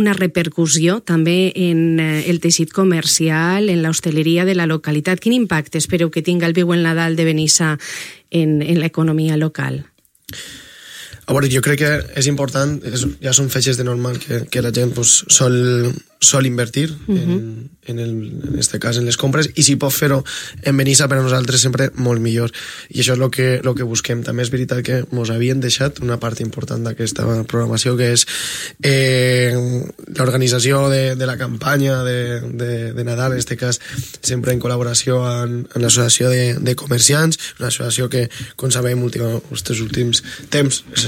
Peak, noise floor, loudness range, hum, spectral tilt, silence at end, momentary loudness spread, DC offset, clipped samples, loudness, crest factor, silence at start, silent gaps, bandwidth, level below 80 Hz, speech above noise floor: 0 dBFS; -36 dBFS; 5 LU; none; -4 dB/octave; 0 s; 10 LU; under 0.1%; under 0.1%; -16 LUFS; 16 dB; 0 s; none; 16.5 kHz; -46 dBFS; 20 dB